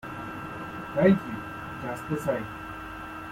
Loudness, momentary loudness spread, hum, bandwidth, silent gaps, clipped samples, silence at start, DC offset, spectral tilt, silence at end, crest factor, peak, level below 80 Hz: -30 LUFS; 16 LU; none; 16.5 kHz; none; under 0.1%; 0.05 s; under 0.1%; -7.5 dB/octave; 0 s; 22 dB; -8 dBFS; -54 dBFS